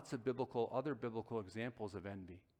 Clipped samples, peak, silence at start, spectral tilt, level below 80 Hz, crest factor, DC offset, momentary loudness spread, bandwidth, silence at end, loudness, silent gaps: under 0.1%; -26 dBFS; 0 s; -7 dB/octave; -74 dBFS; 18 dB; under 0.1%; 9 LU; 11.5 kHz; 0.2 s; -44 LUFS; none